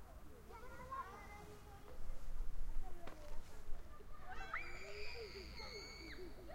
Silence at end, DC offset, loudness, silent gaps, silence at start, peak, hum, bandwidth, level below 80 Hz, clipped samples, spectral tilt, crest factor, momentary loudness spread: 0 s; under 0.1%; -53 LUFS; none; 0 s; -28 dBFS; none; 8.8 kHz; -48 dBFS; under 0.1%; -4 dB/octave; 16 dB; 11 LU